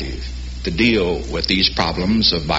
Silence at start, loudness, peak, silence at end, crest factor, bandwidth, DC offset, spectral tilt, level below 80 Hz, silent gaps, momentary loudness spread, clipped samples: 0 s; -17 LUFS; -2 dBFS; 0 s; 16 dB; 8 kHz; under 0.1%; -3 dB/octave; -30 dBFS; none; 12 LU; under 0.1%